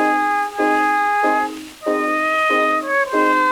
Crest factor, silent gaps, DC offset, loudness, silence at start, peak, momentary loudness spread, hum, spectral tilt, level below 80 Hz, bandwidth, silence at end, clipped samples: 14 dB; none; under 0.1%; -17 LUFS; 0 s; -4 dBFS; 5 LU; none; -2.5 dB/octave; -58 dBFS; 20 kHz; 0 s; under 0.1%